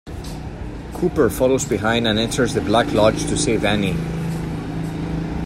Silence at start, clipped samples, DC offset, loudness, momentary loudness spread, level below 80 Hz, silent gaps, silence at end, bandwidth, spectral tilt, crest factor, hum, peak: 0.05 s; under 0.1%; under 0.1%; -19 LUFS; 14 LU; -34 dBFS; none; 0 s; 16 kHz; -5 dB/octave; 18 dB; none; -2 dBFS